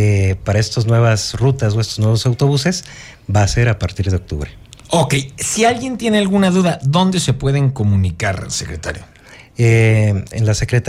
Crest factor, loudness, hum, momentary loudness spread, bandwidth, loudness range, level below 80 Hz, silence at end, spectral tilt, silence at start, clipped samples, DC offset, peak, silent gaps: 14 dB; -16 LUFS; none; 11 LU; 14 kHz; 2 LU; -36 dBFS; 0 s; -5.5 dB/octave; 0 s; under 0.1%; under 0.1%; -2 dBFS; none